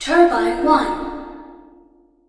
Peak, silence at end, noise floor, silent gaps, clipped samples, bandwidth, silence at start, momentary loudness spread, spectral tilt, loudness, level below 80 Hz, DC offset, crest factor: -2 dBFS; 0.75 s; -53 dBFS; none; under 0.1%; 10.5 kHz; 0 s; 21 LU; -4 dB/octave; -17 LUFS; -42 dBFS; under 0.1%; 18 dB